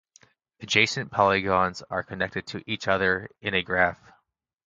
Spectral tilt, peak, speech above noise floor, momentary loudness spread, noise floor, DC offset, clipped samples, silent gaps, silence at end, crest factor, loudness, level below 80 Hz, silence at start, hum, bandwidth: -4 dB/octave; -4 dBFS; 48 dB; 11 LU; -74 dBFS; under 0.1%; under 0.1%; none; 0.75 s; 24 dB; -25 LUFS; -54 dBFS; 0.6 s; none; 9.4 kHz